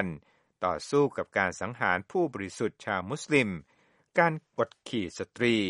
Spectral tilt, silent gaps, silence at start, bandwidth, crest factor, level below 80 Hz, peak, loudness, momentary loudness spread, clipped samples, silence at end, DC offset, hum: -5 dB/octave; none; 0 s; 11.5 kHz; 22 dB; -64 dBFS; -8 dBFS; -30 LUFS; 8 LU; under 0.1%; 0 s; under 0.1%; none